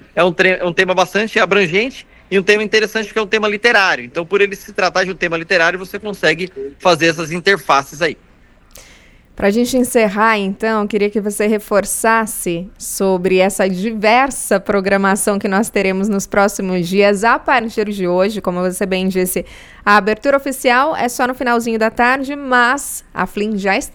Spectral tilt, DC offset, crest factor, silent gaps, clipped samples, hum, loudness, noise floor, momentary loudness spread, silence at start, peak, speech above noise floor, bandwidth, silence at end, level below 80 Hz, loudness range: -4 dB/octave; under 0.1%; 16 dB; none; under 0.1%; none; -15 LUFS; -45 dBFS; 7 LU; 0.15 s; 0 dBFS; 30 dB; 20 kHz; 0 s; -44 dBFS; 2 LU